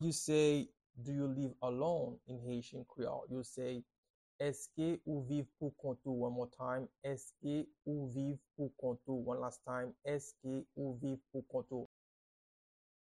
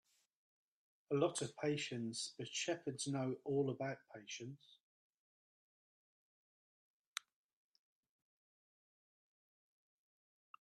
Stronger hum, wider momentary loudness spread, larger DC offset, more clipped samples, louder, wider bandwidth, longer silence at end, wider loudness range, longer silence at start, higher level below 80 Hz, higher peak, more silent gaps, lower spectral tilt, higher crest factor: neither; second, 8 LU vs 12 LU; neither; neither; about the same, -41 LUFS vs -42 LUFS; about the same, 12.5 kHz vs 12 kHz; second, 1.35 s vs 5.9 s; second, 2 LU vs 18 LU; second, 0 s vs 1.1 s; first, -74 dBFS vs -86 dBFS; about the same, -22 dBFS vs -22 dBFS; first, 0.86-0.90 s, 3.98-4.03 s, 4.10-4.39 s vs none; first, -6 dB/octave vs -4.5 dB/octave; about the same, 20 dB vs 24 dB